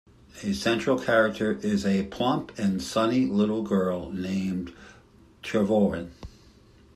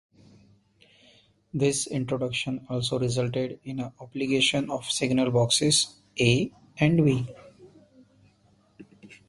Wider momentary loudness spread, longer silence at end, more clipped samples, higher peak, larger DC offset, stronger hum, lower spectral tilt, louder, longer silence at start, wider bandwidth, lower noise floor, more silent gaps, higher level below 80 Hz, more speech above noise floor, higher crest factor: about the same, 12 LU vs 12 LU; first, 0.65 s vs 0.15 s; neither; second, -10 dBFS vs -6 dBFS; neither; neither; first, -6 dB/octave vs -4.5 dB/octave; about the same, -26 LUFS vs -26 LUFS; second, 0.35 s vs 1.55 s; first, 13 kHz vs 11.5 kHz; second, -55 dBFS vs -63 dBFS; neither; about the same, -54 dBFS vs -58 dBFS; second, 29 dB vs 38 dB; about the same, 18 dB vs 22 dB